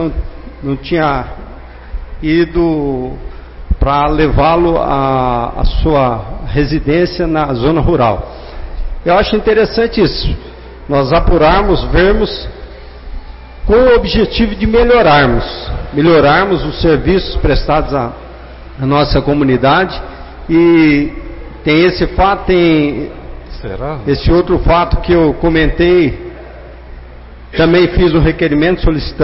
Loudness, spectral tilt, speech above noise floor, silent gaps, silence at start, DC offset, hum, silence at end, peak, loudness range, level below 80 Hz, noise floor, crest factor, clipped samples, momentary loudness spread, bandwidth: -12 LUFS; -10.5 dB/octave; 21 dB; none; 0 s; under 0.1%; none; 0 s; 0 dBFS; 3 LU; -20 dBFS; -32 dBFS; 12 dB; under 0.1%; 20 LU; 5.8 kHz